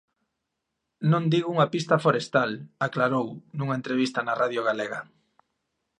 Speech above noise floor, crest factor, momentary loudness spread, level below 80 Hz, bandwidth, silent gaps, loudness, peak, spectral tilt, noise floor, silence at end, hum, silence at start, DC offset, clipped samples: 56 dB; 20 dB; 8 LU; -74 dBFS; 10.5 kHz; none; -26 LUFS; -6 dBFS; -6.5 dB/octave; -82 dBFS; 0.95 s; none; 1 s; under 0.1%; under 0.1%